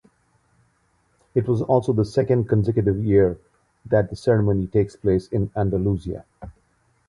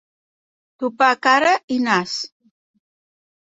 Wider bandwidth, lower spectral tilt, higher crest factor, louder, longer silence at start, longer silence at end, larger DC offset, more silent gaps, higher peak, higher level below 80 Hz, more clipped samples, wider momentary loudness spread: first, 11 kHz vs 8 kHz; first, -9 dB/octave vs -3.5 dB/octave; about the same, 16 dB vs 20 dB; second, -21 LUFS vs -18 LUFS; first, 1.35 s vs 0.8 s; second, 0.55 s vs 1.35 s; neither; second, none vs 1.64-1.68 s; second, -6 dBFS vs -2 dBFS; first, -42 dBFS vs -68 dBFS; neither; second, 7 LU vs 13 LU